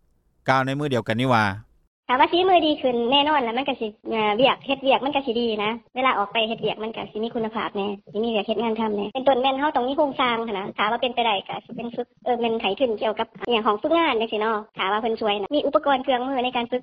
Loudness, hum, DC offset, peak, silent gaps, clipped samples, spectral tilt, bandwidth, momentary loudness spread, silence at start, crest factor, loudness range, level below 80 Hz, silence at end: -23 LUFS; none; under 0.1%; -4 dBFS; 1.87-2.03 s; under 0.1%; -6 dB/octave; 11.5 kHz; 9 LU; 0.45 s; 20 dB; 4 LU; -60 dBFS; 0 s